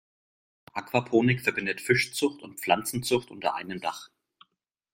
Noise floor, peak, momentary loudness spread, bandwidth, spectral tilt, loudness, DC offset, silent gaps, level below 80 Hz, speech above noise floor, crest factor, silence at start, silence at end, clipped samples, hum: -79 dBFS; -6 dBFS; 11 LU; 16.5 kHz; -4.5 dB/octave; -27 LUFS; under 0.1%; none; -64 dBFS; 51 dB; 24 dB; 0.75 s; 0.9 s; under 0.1%; none